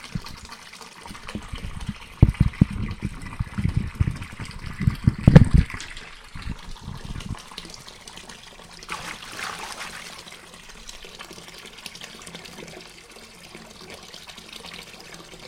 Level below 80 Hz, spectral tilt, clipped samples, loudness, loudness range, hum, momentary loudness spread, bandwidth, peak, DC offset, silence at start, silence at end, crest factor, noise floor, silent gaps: -32 dBFS; -6.5 dB/octave; under 0.1%; -25 LUFS; 18 LU; none; 20 LU; 15.5 kHz; 0 dBFS; under 0.1%; 0 s; 0 s; 26 dB; -45 dBFS; none